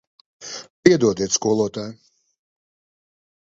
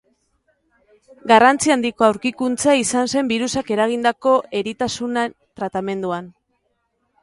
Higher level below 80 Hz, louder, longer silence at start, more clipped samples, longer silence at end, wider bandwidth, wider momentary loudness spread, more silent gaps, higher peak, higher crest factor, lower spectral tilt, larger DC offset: about the same, -56 dBFS vs -58 dBFS; about the same, -19 LUFS vs -19 LUFS; second, 0.4 s vs 1.25 s; neither; first, 1.55 s vs 0.95 s; second, 7.8 kHz vs 11.5 kHz; first, 19 LU vs 13 LU; first, 0.70-0.83 s vs none; about the same, 0 dBFS vs 0 dBFS; about the same, 24 dB vs 20 dB; about the same, -4 dB/octave vs -3.5 dB/octave; neither